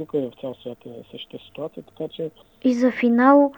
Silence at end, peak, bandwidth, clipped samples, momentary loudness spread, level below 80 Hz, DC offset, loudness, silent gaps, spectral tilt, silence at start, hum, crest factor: 0.05 s; -2 dBFS; 18 kHz; under 0.1%; 21 LU; -66 dBFS; under 0.1%; -20 LUFS; none; -6.5 dB/octave; 0 s; none; 20 dB